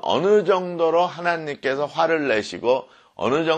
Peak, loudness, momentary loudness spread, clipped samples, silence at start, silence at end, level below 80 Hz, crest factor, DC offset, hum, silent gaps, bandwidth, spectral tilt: -6 dBFS; -21 LUFS; 7 LU; under 0.1%; 0.05 s; 0 s; -64 dBFS; 16 dB; under 0.1%; none; none; 9 kHz; -5 dB/octave